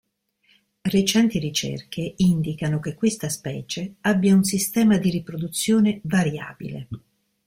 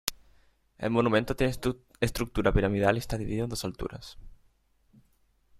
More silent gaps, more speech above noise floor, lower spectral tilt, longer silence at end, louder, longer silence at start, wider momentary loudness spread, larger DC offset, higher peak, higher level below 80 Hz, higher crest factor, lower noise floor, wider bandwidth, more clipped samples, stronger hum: neither; first, 43 dB vs 38 dB; about the same, -5 dB/octave vs -5.5 dB/octave; second, 0.5 s vs 1.25 s; first, -22 LUFS vs -29 LUFS; first, 0.85 s vs 0.05 s; about the same, 14 LU vs 12 LU; neither; about the same, -6 dBFS vs -4 dBFS; second, -54 dBFS vs -42 dBFS; second, 16 dB vs 26 dB; about the same, -65 dBFS vs -67 dBFS; about the same, 16.5 kHz vs 16 kHz; neither; neither